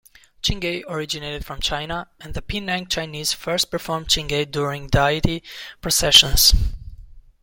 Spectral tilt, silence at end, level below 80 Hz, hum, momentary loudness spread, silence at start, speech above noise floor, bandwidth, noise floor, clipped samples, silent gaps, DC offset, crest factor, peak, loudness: -2.5 dB/octave; 0.2 s; -30 dBFS; none; 18 LU; 0.45 s; 20 dB; 17 kHz; -41 dBFS; under 0.1%; none; under 0.1%; 22 dB; 0 dBFS; -20 LUFS